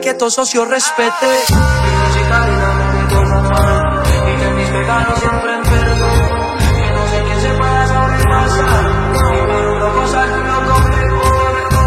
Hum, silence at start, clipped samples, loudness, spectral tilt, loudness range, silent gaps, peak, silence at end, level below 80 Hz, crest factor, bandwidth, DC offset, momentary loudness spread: none; 0 s; under 0.1%; -13 LUFS; -5 dB/octave; 1 LU; none; 0 dBFS; 0 s; -18 dBFS; 12 dB; 16 kHz; under 0.1%; 3 LU